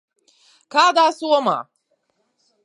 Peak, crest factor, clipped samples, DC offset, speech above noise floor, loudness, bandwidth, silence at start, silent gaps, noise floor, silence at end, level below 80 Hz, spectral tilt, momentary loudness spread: 0 dBFS; 20 dB; under 0.1%; under 0.1%; 52 dB; -18 LUFS; 11.5 kHz; 0.75 s; none; -69 dBFS; 1 s; -86 dBFS; -2.5 dB/octave; 8 LU